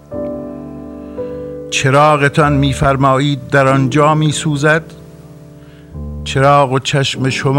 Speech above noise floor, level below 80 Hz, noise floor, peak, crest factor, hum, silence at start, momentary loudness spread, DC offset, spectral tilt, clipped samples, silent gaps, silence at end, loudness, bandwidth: 25 dB; -34 dBFS; -37 dBFS; 0 dBFS; 14 dB; none; 0.1 s; 18 LU; under 0.1%; -5.5 dB/octave; under 0.1%; none; 0 s; -13 LUFS; 12.5 kHz